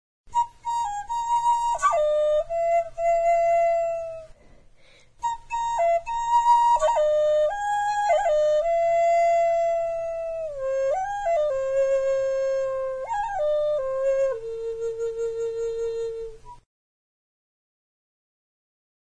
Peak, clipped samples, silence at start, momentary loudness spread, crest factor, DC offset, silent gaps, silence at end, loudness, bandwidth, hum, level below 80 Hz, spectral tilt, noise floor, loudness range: -10 dBFS; under 0.1%; 0.3 s; 10 LU; 14 dB; under 0.1%; none; 2.5 s; -24 LUFS; 10.5 kHz; none; -50 dBFS; -1.5 dB/octave; -53 dBFS; 10 LU